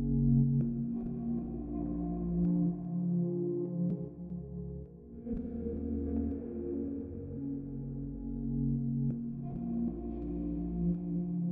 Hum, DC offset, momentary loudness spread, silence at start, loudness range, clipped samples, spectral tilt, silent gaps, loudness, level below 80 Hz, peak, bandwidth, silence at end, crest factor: none; under 0.1%; 10 LU; 0 s; 5 LU; under 0.1%; -15 dB/octave; none; -35 LUFS; -46 dBFS; -18 dBFS; 1.8 kHz; 0 s; 16 dB